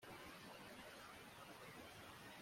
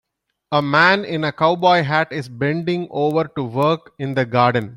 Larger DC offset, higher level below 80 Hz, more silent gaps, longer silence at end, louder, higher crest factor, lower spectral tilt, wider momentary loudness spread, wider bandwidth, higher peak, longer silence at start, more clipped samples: neither; second, -78 dBFS vs -60 dBFS; neither; about the same, 0 s vs 0 s; second, -57 LUFS vs -18 LUFS; about the same, 14 dB vs 18 dB; second, -3.5 dB/octave vs -7 dB/octave; second, 1 LU vs 9 LU; about the same, 16.5 kHz vs 16 kHz; second, -44 dBFS vs -2 dBFS; second, 0 s vs 0.5 s; neither